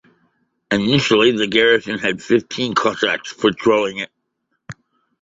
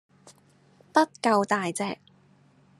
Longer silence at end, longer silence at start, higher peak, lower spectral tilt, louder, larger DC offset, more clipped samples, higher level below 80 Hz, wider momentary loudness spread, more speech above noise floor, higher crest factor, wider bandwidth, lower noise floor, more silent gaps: second, 0.5 s vs 0.85 s; first, 0.7 s vs 0.25 s; first, 0 dBFS vs -6 dBFS; about the same, -4.5 dB/octave vs -4.5 dB/octave; first, -17 LUFS vs -26 LUFS; neither; neither; first, -56 dBFS vs -80 dBFS; about the same, 8 LU vs 10 LU; first, 55 dB vs 35 dB; second, 18 dB vs 24 dB; second, 8 kHz vs 13 kHz; first, -72 dBFS vs -60 dBFS; neither